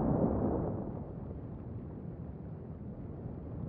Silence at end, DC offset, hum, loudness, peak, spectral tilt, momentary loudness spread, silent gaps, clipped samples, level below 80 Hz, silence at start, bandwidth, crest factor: 0 s; under 0.1%; none; -39 LUFS; -18 dBFS; -12.5 dB/octave; 13 LU; none; under 0.1%; -48 dBFS; 0 s; 3.2 kHz; 18 dB